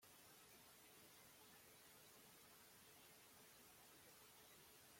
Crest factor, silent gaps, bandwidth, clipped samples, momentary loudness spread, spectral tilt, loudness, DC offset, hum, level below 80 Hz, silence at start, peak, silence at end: 14 dB; none; 16.5 kHz; under 0.1%; 0 LU; -1.5 dB/octave; -65 LUFS; under 0.1%; none; under -90 dBFS; 0 s; -54 dBFS; 0 s